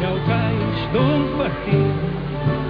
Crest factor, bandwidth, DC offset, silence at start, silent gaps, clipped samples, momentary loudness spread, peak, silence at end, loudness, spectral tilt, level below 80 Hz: 14 dB; 5.2 kHz; under 0.1%; 0 s; none; under 0.1%; 5 LU; -6 dBFS; 0 s; -20 LUFS; -10 dB/octave; -36 dBFS